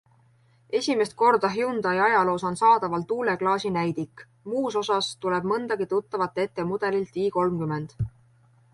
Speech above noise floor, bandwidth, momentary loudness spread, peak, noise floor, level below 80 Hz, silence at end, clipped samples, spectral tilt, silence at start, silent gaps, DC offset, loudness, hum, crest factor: 36 dB; 11.5 kHz; 10 LU; -8 dBFS; -60 dBFS; -56 dBFS; 0.65 s; under 0.1%; -5.5 dB/octave; 0.7 s; none; under 0.1%; -25 LUFS; none; 16 dB